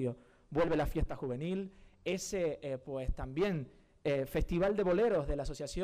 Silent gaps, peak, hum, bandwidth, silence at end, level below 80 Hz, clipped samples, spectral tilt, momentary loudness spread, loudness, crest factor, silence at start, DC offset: none; -24 dBFS; none; 15.5 kHz; 0 s; -44 dBFS; under 0.1%; -6 dB/octave; 10 LU; -35 LUFS; 10 dB; 0 s; under 0.1%